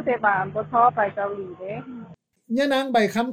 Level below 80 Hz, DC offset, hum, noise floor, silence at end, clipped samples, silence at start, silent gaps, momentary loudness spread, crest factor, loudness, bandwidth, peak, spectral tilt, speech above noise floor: -64 dBFS; under 0.1%; none; -45 dBFS; 0 s; under 0.1%; 0 s; none; 15 LU; 18 dB; -22 LUFS; 15.5 kHz; -6 dBFS; -5.5 dB/octave; 23 dB